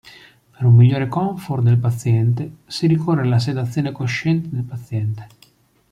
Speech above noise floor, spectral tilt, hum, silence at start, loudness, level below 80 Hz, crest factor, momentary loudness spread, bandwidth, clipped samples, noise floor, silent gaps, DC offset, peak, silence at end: 37 dB; -7.5 dB/octave; none; 0.6 s; -19 LUFS; -54 dBFS; 14 dB; 13 LU; 10.5 kHz; under 0.1%; -55 dBFS; none; under 0.1%; -4 dBFS; 0.65 s